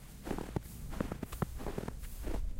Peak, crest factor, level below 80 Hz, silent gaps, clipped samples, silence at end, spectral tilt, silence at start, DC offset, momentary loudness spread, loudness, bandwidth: -18 dBFS; 20 dB; -42 dBFS; none; under 0.1%; 0 s; -6 dB/octave; 0 s; under 0.1%; 5 LU; -42 LUFS; 16 kHz